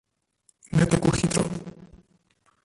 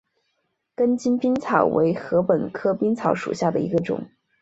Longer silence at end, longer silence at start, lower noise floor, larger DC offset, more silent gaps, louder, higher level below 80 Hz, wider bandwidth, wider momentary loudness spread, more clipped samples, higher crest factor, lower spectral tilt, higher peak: first, 0.8 s vs 0.35 s; about the same, 0.75 s vs 0.8 s; second, -67 dBFS vs -74 dBFS; neither; neither; about the same, -24 LUFS vs -22 LUFS; first, -46 dBFS vs -60 dBFS; first, 11.5 kHz vs 8 kHz; first, 14 LU vs 6 LU; neither; about the same, 22 dB vs 20 dB; second, -5.5 dB/octave vs -7.5 dB/octave; second, -6 dBFS vs -2 dBFS